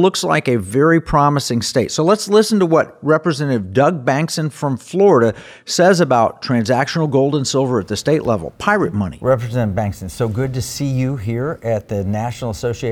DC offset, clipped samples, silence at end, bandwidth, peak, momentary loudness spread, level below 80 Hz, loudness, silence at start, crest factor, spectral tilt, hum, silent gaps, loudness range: under 0.1%; under 0.1%; 0 s; 17 kHz; -2 dBFS; 8 LU; -44 dBFS; -17 LUFS; 0 s; 14 dB; -5.5 dB/octave; none; none; 5 LU